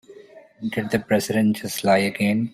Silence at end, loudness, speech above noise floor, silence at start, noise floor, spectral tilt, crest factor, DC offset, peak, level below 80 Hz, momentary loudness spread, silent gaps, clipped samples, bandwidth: 0.05 s; -22 LUFS; 25 dB; 0.1 s; -46 dBFS; -5.5 dB/octave; 16 dB; under 0.1%; -6 dBFS; -60 dBFS; 9 LU; none; under 0.1%; 16 kHz